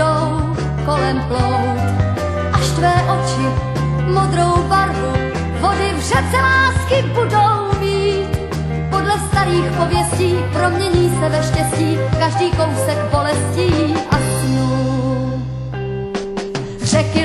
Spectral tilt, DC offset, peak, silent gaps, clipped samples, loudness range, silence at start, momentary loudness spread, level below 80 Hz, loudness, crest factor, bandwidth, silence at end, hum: -5.5 dB/octave; under 0.1%; 0 dBFS; none; under 0.1%; 2 LU; 0 s; 7 LU; -28 dBFS; -17 LUFS; 16 dB; 13.5 kHz; 0 s; none